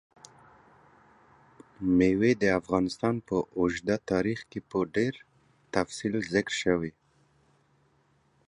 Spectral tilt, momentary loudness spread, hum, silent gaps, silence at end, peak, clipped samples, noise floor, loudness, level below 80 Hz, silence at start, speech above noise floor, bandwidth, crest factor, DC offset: -6 dB/octave; 9 LU; none; none; 1.6 s; -8 dBFS; under 0.1%; -67 dBFS; -28 LUFS; -56 dBFS; 1.8 s; 40 dB; 11 kHz; 22 dB; under 0.1%